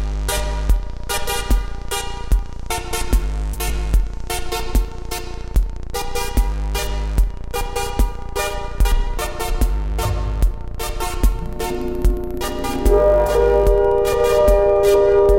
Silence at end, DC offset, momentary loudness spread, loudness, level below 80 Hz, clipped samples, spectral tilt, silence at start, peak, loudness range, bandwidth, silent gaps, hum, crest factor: 0 s; under 0.1%; 11 LU; -20 LUFS; -20 dBFS; under 0.1%; -5 dB/octave; 0 s; -2 dBFS; 7 LU; 16.5 kHz; none; none; 16 dB